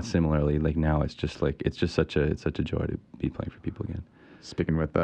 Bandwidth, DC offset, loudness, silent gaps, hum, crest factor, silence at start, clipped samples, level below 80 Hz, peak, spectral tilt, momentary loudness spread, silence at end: 8.8 kHz; under 0.1%; -29 LUFS; none; none; 20 dB; 0 s; under 0.1%; -38 dBFS; -8 dBFS; -7.5 dB/octave; 11 LU; 0 s